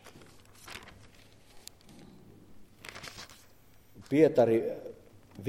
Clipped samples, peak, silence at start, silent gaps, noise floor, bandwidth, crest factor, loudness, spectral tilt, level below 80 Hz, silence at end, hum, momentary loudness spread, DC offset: under 0.1%; -10 dBFS; 0.65 s; none; -61 dBFS; 16.5 kHz; 24 dB; -27 LUFS; -6.5 dB/octave; -64 dBFS; 0 s; none; 28 LU; under 0.1%